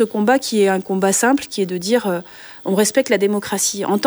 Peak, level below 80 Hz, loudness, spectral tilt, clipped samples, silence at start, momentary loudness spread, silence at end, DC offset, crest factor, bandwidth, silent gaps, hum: -2 dBFS; -62 dBFS; -17 LUFS; -3.5 dB/octave; under 0.1%; 0 s; 8 LU; 0 s; under 0.1%; 16 dB; over 20 kHz; none; none